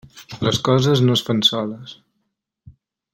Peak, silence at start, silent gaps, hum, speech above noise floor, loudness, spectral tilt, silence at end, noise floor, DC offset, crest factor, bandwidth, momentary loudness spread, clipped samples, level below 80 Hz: -4 dBFS; 0.15 s; none; none; 56 dB; -18 LUFS; -5.5 dB/octave; 0.45 s; -74 dBFS; under 0.1%; 18 dB; 16.5 kHz; 20 LU; under 0.1%; -54 dBFS